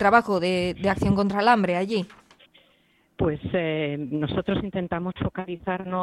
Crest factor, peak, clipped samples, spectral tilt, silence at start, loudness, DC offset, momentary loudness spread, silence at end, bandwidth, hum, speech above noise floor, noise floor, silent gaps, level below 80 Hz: 20 dB; -4 dBFS; under 0.1%; -7 dB/octave; 0 s; -25 LUFS; under 0.1%; 10 LU; 0 s; 12.5 kHz; none; 39 dB; -63 dBFS; none; -48 dBFS